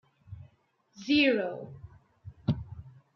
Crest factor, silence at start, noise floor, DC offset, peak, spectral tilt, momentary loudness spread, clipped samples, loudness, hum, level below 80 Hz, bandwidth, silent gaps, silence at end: 20 dB; 0.3 s; -68 dBFS; under 0.1%; -14 dBFS; -6.5 dB/octave; 26 LU; under 0.1%; -28 LUFS; none; -58 dBFS; 6.6 kHz; none; 0.25 s